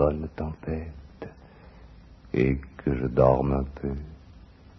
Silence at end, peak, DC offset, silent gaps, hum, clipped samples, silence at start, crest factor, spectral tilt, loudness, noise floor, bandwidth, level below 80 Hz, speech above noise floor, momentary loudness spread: 0.45 s; -6 dBFS; under 0.1%; none; none; under 0.1%; 0 s; 22 dB; -10.5 dB/octave; -27 LUFS; -49 dBFS; 6 kHz; -38 dBFS; 24 dB; 22 LU